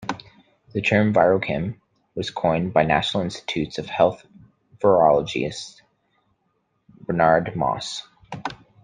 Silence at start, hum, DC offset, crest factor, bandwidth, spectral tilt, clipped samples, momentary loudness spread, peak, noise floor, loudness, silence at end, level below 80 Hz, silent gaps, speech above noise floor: 0 s; none; under 0.1%; 20 dB; 9.6 kHz; -5.5 dB/octave; under 0.1%; 18 LU; -2 dBFS; -70 dBFS; -21 LUFS; 0.3 s; -54 dBFS; none; 50 dB